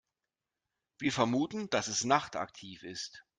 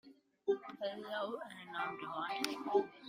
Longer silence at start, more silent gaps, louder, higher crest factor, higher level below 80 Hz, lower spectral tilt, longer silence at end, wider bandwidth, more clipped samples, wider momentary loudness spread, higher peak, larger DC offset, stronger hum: first, 1 s vs 0.05 s; neither; first, -33 LUFS vs -40 LUFS; about the same, 24 dB vs 24 dB; first, -72 dBFS vs -86 dBFS; about the same, -3.5 dB/octave vs -3.5 dB/octave; first, 0.2 s vs 0 s; second, 9.8 kHz vs 15.5 kHz; neither; first, 13 LU vs 8 LU; first, -12 dBFS vs -16 dBFS; neither; neither